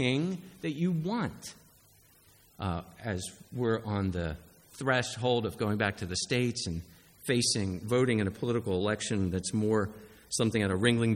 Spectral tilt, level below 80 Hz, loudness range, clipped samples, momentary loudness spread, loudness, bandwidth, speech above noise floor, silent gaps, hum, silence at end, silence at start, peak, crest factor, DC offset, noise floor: -5 dB/octave; -56 dBFS; 6 LU; under 0.1%; 11 LU; -31 LUFS; 17 kHz; 31 dB; none; none; 0 s; 0 s; -10 dBFS; 20 dB; under 0.1%; -61 dBFS